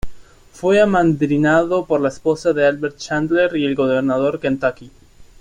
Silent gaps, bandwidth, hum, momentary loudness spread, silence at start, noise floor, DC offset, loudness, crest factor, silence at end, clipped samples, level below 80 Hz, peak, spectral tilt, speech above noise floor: none; 11 kHz; none; 7 LU; 0.05 s; -37 dBFS; under 0.1%; -17 LUFS; 14 dB; 0.2 s; under 0.1%; -44 dBFS; -4 dBFS; -6.5 dB/octave; 20 dB